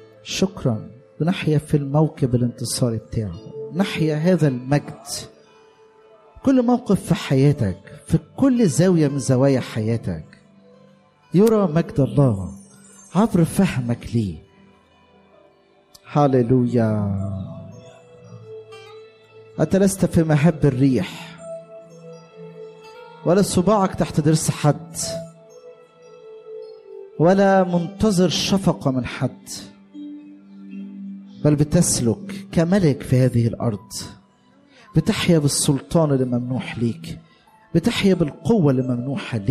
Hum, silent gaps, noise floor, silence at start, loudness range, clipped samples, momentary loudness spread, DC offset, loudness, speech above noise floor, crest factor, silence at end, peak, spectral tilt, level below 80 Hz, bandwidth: none; none; -55 dBFS; 0.25 s; 4 LU; under 0.1%; 20 LU; under 0.1%; -20 LUFS; 36 dB; 14 dB; 0 s; -6 dBFS; -6 dB/octave; -46 dBFS; 15 kHz